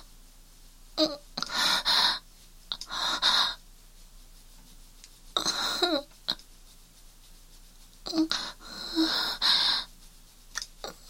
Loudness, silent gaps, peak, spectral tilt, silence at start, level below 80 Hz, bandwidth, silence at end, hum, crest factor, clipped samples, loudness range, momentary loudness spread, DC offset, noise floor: -27 LUFS; none; -8 dBFS; -1 dB/octave; 0 s; -52 dBFS; 16.5 kHz; 0 s; none; 24 dB; under 0.1%; 6 LU; 16 LU; under 0.1%; -53 dBFS